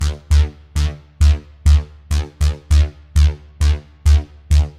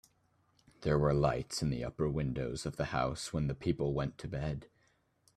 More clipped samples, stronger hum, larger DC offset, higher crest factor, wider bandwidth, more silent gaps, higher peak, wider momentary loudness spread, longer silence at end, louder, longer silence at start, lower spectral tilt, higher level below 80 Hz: neither; neither; neither; second, 12 dB vs 20 dB; second, 11 kHz vs 13 kHz; neither; first, -2 dBFS vs -14 dBFS; second, 6 LU vs 9 LU; second, 0.1 s vs 0.7 s; first, -18 LUFS vs -35 LUFS; second, 0 s vs 0.8 s; about the same, -5.5 dB/octave vs -6 dB/octave; first, -18 dBFS vs -50 dBFS